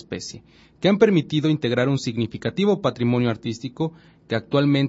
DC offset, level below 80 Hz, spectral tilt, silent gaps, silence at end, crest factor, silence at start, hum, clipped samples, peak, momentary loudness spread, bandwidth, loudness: under 0.1%; -58 dBFS; -6.5 dB/octave; none; 0 s; 18 dB; 0.1 s; none; under 0.1%; -4 dBFS; 11 LU; 8 kHz; -22 LUFS